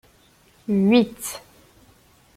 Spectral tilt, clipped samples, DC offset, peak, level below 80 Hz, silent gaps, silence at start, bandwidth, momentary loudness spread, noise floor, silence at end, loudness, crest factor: -5.5 dB/octave; under 0.1%; under 0.1%; -4 dBFS; -60 dBFS; none; 0.7 s; 16 kHz; 20 LU; -56 dBFS; 1 s; -21 LUFS; 20 dB